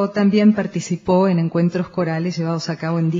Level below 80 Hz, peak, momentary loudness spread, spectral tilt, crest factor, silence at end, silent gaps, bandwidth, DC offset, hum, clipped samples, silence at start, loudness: -56 dBFS; -4 dBFS; 8 LU; -7 dB/octave; 14 dB; 0 s; none; 7.6 kHz; under 0.1%; none; under 0.1%; 0 s; -19 LUFS